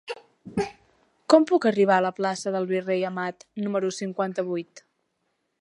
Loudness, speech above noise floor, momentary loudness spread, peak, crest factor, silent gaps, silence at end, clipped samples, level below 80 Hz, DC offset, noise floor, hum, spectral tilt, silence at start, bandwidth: -25 LUFS; 51 dB; 14 LU; -2 dBFS; 24 dB; none; 0.8 s; under 0.1%; -64 dBFS; under 0.1%; -75 dBFS; none; -5.5 dB/octave; 0.05 s; 11 kHz